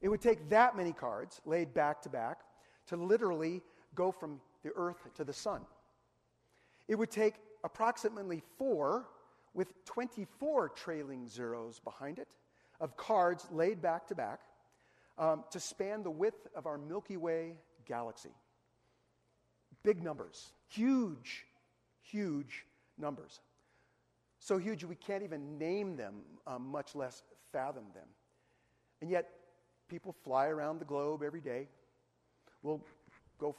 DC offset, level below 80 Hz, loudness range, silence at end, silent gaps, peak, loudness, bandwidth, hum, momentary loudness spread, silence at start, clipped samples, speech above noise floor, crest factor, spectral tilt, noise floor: under 0.1%; -74 dBFS; 6 LU; 0.05 s; none; -16 dBFS; -38 LUFS; 13 kHz; none; 16 LU; 0 s; under 0.1%; 39 dB; 24 dB; -5.5 dB/octave; -77 dBFS